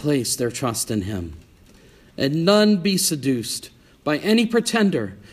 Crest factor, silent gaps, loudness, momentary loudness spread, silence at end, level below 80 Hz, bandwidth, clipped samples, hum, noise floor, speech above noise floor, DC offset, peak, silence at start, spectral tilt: 20 dB; none; -21 LUFS; 13 LU; 0.1 s; -52 dBFS; 15.5 kHz; under 0.1%; none; -50 dBFS; 29 dB; under 0.1%; -2 dBFS; 0 s; -4.5 dB/octave